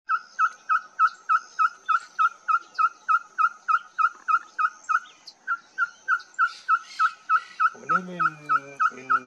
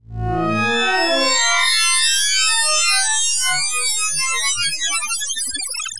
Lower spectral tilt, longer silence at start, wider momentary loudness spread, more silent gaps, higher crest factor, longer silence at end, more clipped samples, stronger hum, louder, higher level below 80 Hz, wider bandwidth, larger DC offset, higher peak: first, -2.5 dB/octave vs -0.5 dB/octave; about the same, 0.1 s vs 0 s; about the same, 5 LU vs 7 LU; neither; about the same, 14 dB vs 14 dB; about the same, 0 s vs 0 s; neither; neither; second, -25 LUFS vs -16 LUFS; second, -84 dBFS vs -44 dBFS; second, 8.6 kHz vs 11.5 kHz; second, under 0.1% vs 3%; second, -10 dBFS vs -4 dBFS